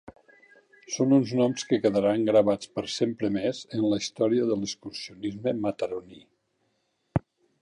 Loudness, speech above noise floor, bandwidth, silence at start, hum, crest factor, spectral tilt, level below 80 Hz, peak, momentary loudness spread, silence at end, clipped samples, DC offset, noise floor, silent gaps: -27 LUFS; 48 dB; 11 kHz; 0.9 s; none; 18 dB; -5.5 dB/octave; -58 dBFS; -8 dBFS; 12 LU; 0.45 s; under 0.1%; under 0.1%; -74 dBFS; none